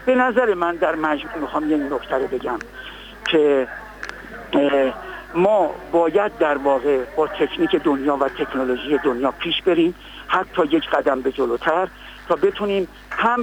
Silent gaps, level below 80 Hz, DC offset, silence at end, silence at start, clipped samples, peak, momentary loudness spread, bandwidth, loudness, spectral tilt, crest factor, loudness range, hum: none; -48 dBFS; under 0.1%; 0 s; 0 s; under 0.1%; -6 dBFS; 11 LU; 17 kHz; -20 LUFS; -6 dB/octave; 14 dB; 3 LU; none